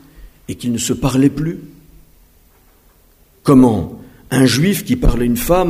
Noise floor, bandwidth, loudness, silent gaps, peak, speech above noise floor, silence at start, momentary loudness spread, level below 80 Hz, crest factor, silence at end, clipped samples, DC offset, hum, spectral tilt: -51 dBFS; 16 kHz; -15 LUFS; none; 0 dBFS; 37 dB; 0.2 s; 14 LU; -28 dBFS; 16 dB; 0 s; under 0.1%; under 0.1%; none; -5.5 dB/octave